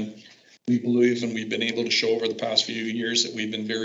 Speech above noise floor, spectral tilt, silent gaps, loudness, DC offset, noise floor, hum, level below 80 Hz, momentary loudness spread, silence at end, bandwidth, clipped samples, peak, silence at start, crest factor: 27 dB; -3.5 dB/octave; none; -24 LUFS; under 0.1%; -51 dBFS; none; -80 dBFS; 6 LU; 0 s; 8 kHz; under 0.1%; -4 dBFS; 0 s; 20 dB